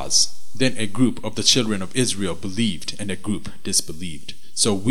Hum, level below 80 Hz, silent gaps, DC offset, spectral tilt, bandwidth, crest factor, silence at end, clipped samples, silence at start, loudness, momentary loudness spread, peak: none; -50 dBFS; none; 5%; -3 dB/octave; 18 kHz; 22 dB; 0 s; under 0.1%; 0 s; -22 LUFS; 13 LU; 0 dBFS